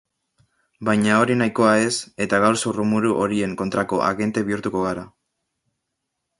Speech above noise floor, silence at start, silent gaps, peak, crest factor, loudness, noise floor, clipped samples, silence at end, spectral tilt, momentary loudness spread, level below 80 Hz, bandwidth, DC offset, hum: 59 dB; 0.8 s; none; -2 dBFS; 20 dB; -20 LUFS; -79 dBFS; under 0.1%; 1.3 s; -5 dB/octave; 7 LU; -56 dBFS; 11.5 kHz; under 0.1%; none